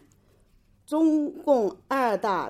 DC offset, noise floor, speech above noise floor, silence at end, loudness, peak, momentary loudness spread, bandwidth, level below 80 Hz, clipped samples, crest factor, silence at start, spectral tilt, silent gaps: under 0.1%; -61 dBFS; 37 dB; 0 s; -25 LUFS; -10 dBFS; 4 LU; 14 kHz; -64 dBFS; under 0.1%; 16 dB; 0.9 s; -6 dB/octave; none